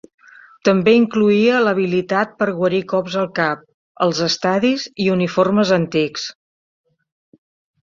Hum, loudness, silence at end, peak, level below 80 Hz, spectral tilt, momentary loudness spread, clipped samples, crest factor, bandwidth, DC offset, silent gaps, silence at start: none; -17 LUFS; 1.5 s; -2 dBFS; -60 dBFS; -5.5 dB/octave; 7 LU; under 0.1%; 16 dB; 7.4 kHz; under 0.1%; 3.74-3.95 s; 0.65 s